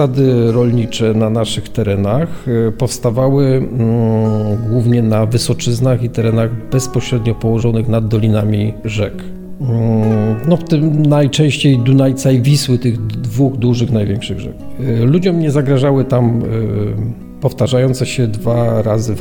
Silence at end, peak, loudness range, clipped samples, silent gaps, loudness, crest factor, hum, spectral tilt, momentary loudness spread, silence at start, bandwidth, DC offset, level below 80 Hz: 0 s; 0 dBFS; 3 LU; under 0.1%; none; -14 LUFS; 14 dB; none; -7 dB/octave; 7 LU; 0 s; 17.5 kHz; under 0.1%; -38 dBFS